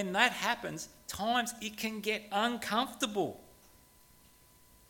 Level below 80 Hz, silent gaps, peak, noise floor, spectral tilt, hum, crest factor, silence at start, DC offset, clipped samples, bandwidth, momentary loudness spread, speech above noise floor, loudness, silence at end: -66 dBFS; none; -10 dBFS; -62 dBFS; -2.5 dB/octave; none; 26 dB; 0 s; under 0.1%; under 0.1%; 17.5 kHz; 12 LU; 28 dB; -33 LUFS; 1.4 s